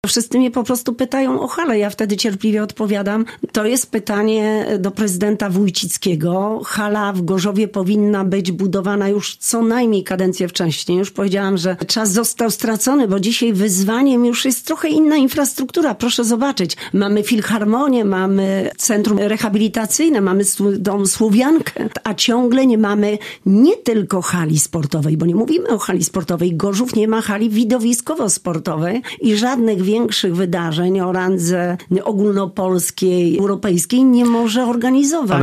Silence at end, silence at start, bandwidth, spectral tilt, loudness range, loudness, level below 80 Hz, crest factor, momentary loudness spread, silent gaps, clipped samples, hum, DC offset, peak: 0 s; 0.05 s; 15.5 kHz; -4.5 dB/octave; 3 LU; -16 LUFS; -56 dBFS; 16 dB; 5 LU; none; under 0.1%; none; under 0.1%; 0 dBFS